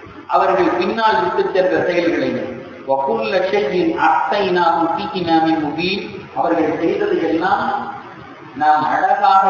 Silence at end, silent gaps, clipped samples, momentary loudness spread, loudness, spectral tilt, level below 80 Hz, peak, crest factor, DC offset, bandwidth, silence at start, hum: 0 s; none; under 0.1%; 9 LU; -17 LUFS; -6.5 dB/octave; -52 dBFS; -2 dBFS; 16 dB; under 0.1%; 7 kHz; 0 s; none